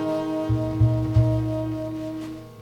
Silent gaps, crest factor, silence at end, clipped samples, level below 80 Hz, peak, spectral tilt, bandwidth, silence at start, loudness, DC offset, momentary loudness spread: none; 16 dB; 0 s; under 0.1%; -36 dBFS; -8 dBFS; -9 dB/octave; 7.2 kHz; 0 s; -24 LUFS; under 0.1%; 11 LU